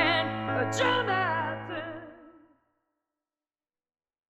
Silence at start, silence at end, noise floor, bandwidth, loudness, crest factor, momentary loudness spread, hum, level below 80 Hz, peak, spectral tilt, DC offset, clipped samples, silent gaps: 0 s; 2 s; under -90 dBFS; 12.5 kHz; -28 LUFS; 20 dB; 15 LU; none; -66 dBFS; -12 dBFS; -4.5 dB/octave; under 0.1%; under 0.1%; none